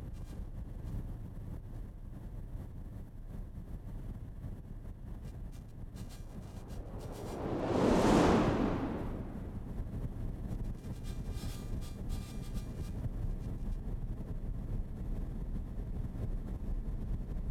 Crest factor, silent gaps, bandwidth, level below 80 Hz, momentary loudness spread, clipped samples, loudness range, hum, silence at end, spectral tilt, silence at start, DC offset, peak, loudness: 22 dB; none; 14.5 kHz; -42 dBFS; 16 LU; under 0.1%; 15 LU; none; 0 s; -7 dB/octave; 0 s; under 0.1%; -14 dBFS; -39 LUFS